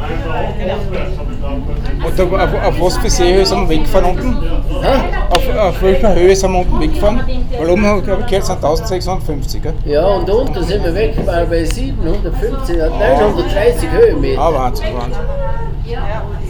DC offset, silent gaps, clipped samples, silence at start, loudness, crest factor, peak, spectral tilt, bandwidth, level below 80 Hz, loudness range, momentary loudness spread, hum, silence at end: under 0.1%; none; under 0.1%; 0 s; -15 LUFS; 12 dB; 0 dBFS; -5.5 dB/octave; 18.5 kHz; -16 dBFS; 3 LU; 10 LU; none; 0 s